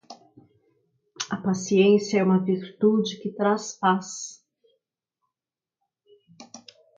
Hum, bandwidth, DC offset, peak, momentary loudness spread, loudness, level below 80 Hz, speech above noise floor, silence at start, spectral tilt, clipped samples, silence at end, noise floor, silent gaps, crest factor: none; 7.8 kHz; under 0.1%; -8 dBFS; 16 LU; -23 LUFS; -72 dBFS; over 68 dB; 0.1 s; -5.5 dB/octave; under 0.1%; 0.4 s; under -90 dBFS; none; 18 dB